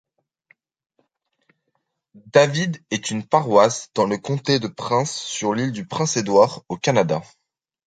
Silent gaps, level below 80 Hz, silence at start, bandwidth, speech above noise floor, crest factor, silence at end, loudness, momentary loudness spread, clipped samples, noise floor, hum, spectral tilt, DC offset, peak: none; -62 dBFS; 2.25 s; 9.4 kHz; 54 dB; 20 dB; 0.65 s; -20 LUFS; 9 LU; under 0.1%; -74 dBFS; none; -4.5 dB/octave; under 0.1%; 0 dBFS